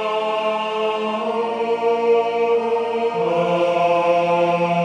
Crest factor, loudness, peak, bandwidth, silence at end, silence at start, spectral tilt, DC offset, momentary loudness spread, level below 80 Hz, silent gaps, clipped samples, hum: 12 dB; -19 LUFS; -6 dBFS; 9.6 kHz; 0 s; 0 s; -6 dB/octave; under 0.1%; 5 LU; -70 dBFS; none; under 0.1%; none